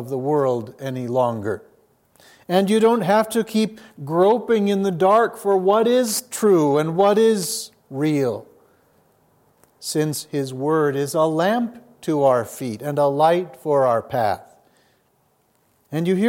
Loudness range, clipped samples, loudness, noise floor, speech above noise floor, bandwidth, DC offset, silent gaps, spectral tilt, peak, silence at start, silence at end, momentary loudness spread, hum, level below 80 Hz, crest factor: 6 LU; under 0.1%; -20 LUFS; -63 dBFS; 44 dB; 17 kHz; under 0.1%; none; -5.5 dB/octave; -4 dBFS; 0 s; 0 s; 12 LU; none; -70 dBFS; 16 dB